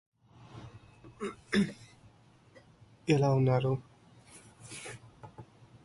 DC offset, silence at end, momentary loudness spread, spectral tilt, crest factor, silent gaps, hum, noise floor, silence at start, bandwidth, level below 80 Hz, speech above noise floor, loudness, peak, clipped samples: under 0.1%; 0.4 s; 27 LU; -7 dB/octave; 20 dB; none; none; -61 dBFS; 0.55 s; 11.5 kHz; -64 dBFS; 32 dB; -31 LUFS; -14 dBFS; under 0.1%